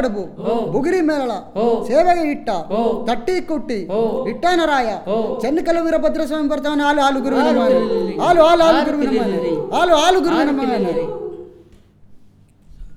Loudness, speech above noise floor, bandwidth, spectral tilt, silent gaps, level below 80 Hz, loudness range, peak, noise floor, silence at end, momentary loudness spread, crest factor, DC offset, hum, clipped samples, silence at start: -17 LUFS; 31 dB; 15.5 kHz; -5 dB/octave; none; -42 dBFS; 4 LU; 0 dBFS; -47 dBFS; 0 s; 9 LU; 16 dB; under 0.1%; none; under 0.1%; 0 s